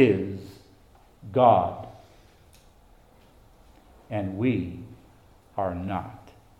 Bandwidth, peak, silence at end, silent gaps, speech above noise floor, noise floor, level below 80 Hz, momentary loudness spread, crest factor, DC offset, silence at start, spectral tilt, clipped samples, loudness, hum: 14 kHz; -6 dBFS; 0.3 s; none; 32 dB; -56 dBFS; -58 dBFS; 25 LU; 22 dB; under 0.1%; 0 s; -8.5 dB/octave; under 0.1%; -26 LUFS; none